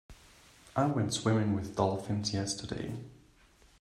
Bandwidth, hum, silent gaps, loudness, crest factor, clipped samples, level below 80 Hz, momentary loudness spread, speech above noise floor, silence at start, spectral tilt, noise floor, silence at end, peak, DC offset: 13 kHz; none; none; -32 LUFS; 22 dB; under 0.1%; -60 dBFS; 10 LU; 31 dB; 0.1 s; -5.5 dB/octave; -62 dBFS; 0.65 s; -12 dBFS; under 0.1%